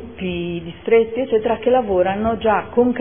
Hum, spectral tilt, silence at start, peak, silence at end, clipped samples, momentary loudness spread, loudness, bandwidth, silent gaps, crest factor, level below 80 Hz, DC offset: none; -11 dB/octave; 0 s; -2 dBFS; 0 s; under 0.1%; 9 LU; -19 LUFS; 3.6 kHz; none; 16 dB; -44 dBFS; 0.4%